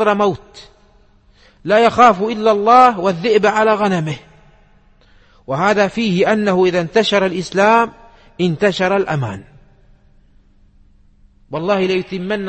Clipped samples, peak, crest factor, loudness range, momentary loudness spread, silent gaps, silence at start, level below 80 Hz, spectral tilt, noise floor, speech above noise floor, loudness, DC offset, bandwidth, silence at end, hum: under 0.1%; 0 dBFS; 16 dB; 9 LU; 13 LU; none; 0 s; -50 dBFS; -5.5 dB/octave; -50 dBFS; 36 dB; -15 LUFS; under 0.1%; 8.8 kHz; 0 s; none